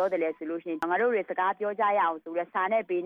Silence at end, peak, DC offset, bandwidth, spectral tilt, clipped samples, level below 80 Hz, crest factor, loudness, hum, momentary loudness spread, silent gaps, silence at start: 0 s; -16 dBFS; under 0.1%; 8.6 kHz; -6.5 dB/octave; under 0.1%; -78 dBFS; 12 dB; -28 LUFS; none; 7 LU; none; 0 s